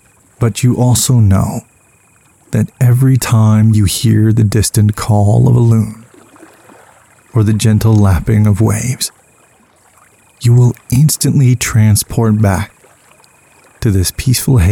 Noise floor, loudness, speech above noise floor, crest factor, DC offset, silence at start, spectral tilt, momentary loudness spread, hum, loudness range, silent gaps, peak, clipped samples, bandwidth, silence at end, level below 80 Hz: -49 dBFS; -11 LUFS; 39 dB; 10 dB; under 0.1%; 0.4 s; -6 dB/octave; 8 LU; none; 3 LU; none; -2 dBFS; under 0.1%; 17 kHz; 0 s; -32 dBFS